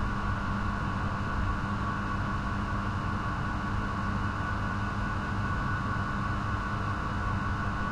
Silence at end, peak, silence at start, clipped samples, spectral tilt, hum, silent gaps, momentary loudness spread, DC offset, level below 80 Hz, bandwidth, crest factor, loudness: 0 s; -18 dBFS; 0 s; under 0.1%; -7 dB/octave; none; none; 1 LU; under 0.1%; -38 dBFS; 10.5 kHz; 12 dB; -32 LUFS